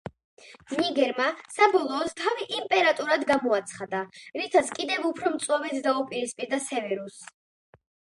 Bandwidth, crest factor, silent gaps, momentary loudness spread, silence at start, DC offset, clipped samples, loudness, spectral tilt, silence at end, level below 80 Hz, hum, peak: 11.5 kHz; 22 dB; 0.24-0.37 s; 11 LU; 0.05 s; under 0.1%; under 0.1%; -26 LUFS; -3 dB/octave; 0.95 s; -70 dBFS; none; -6 dBFS